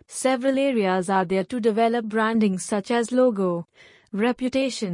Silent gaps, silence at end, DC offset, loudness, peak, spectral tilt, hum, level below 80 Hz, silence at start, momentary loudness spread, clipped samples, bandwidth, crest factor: none; 0 s; under 0.1%; -23 LUFS; -8 dBFS; -5 dB/octave; none; -64 dBFS; 0.1 s; 5 LU; under 0.1%; 11 kHz; 14 dB